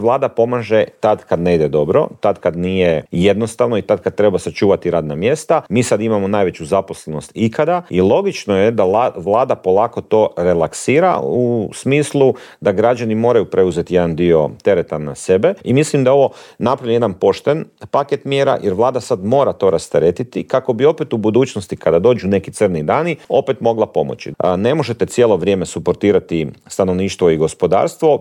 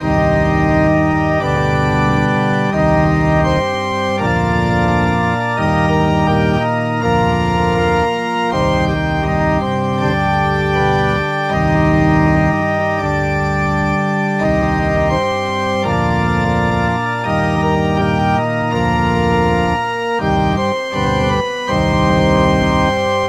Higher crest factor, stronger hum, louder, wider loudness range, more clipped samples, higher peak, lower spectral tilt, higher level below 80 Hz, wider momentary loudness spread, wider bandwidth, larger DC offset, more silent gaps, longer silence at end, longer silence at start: about the same, 14 dB vs 14 dB; neither; about the same, -15 LUFS vs -15 LUFS; about the same, 2 LU vs 1 LU; neither; about the same, -2 dBFS vs -2 dBFS; about the same, -6.5 dB/octave vs -7 dB/octave; second, -48 dBFS vs -28 dBFS; about the same, 5 LU vs 4 LU; first, 13 kHz vs 11.5 kHz; neither; neither; about the same, 0 s vs 0 s; about the same, 0 s vs 0 s